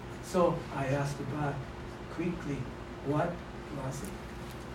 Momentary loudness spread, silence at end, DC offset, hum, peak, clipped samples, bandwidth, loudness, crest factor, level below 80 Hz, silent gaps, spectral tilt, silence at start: 13 LU; 0 s; under 0.1%; none; -14 dBFS; under 0.1%; 16 kHz; -35 LUFS; 20 dB; -50 dBFS; none; -6.5 dB/octave; 0 s